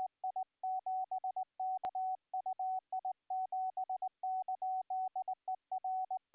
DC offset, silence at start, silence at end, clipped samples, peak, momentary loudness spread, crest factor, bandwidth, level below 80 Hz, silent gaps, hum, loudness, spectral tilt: under 0.1%; 0 s; 0.15 s; under 0.1%; -34 dBFS; 3 LU; 6 dB; 4 kHz; under -90 dBFS; none; none; -40 LUFS; -2 dB/octave